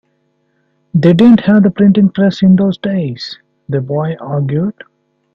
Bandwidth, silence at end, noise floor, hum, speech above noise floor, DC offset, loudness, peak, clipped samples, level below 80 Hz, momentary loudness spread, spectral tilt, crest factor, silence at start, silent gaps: 6.8 kHz; 0.65 s; -61 dBFS; none; 50 dB; under 0.1%; -12 LUFS; 0 dBFS; under 0.1%; -50 dBFS; 14 LU; -9 dB/octave; 12 dB; 0.95 s; none